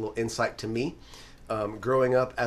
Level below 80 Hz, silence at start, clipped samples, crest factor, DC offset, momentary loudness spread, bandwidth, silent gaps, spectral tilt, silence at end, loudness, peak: -52 dBFS; 0 s; under 0.1%; 16 dB; under 0.1%; 23 LU; 14 kHz; none; -5.5 dB/octave; 0 s; -28 LUFS; -12 dBFS